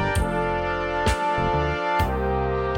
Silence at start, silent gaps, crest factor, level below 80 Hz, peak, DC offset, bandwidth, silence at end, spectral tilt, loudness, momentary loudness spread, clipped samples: 0 s; none; 14 dB; -32 dBFS; -10 dBFS; under 0.1%; 16.5 kHz; 0 s; -6 dB/octave; -24 LUFS; 2 LU; under 0.1%